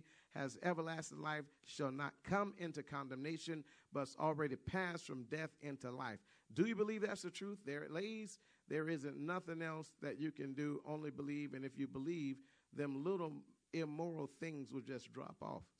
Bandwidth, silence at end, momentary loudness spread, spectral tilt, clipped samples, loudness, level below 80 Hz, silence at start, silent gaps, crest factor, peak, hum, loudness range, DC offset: 11 kHz; 0.15 s; 9 LU; -6 dB/octave; under 0.1%; -45 LUFS; -76 dBFS; 0.35 s; none; 20 dB; -24 dBFS; none; 2 LU; under 0.1%